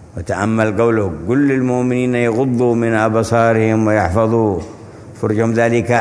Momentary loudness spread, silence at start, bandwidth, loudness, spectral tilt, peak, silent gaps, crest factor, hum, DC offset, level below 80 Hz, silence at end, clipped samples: 6 LU; 0 s; 11 kHz; -15 LUFS; -7.5 dB/octave; 0 dBFS; none; 14 dB; none; under 0.1%; -42 dBFS; 0 s; under 0.1%